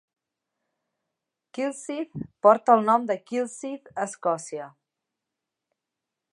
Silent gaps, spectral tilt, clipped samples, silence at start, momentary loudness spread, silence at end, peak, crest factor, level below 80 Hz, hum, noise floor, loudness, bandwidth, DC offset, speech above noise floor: none; -5 dB/octave; under 0.1%; 1.55 s; 17 LU; 1.65 s; -4 dBFS; 24 dB; -72 dBFS; none; -86 dBFS; -24 LUFS; 11.5 kHz; under 0.1%; 62 dB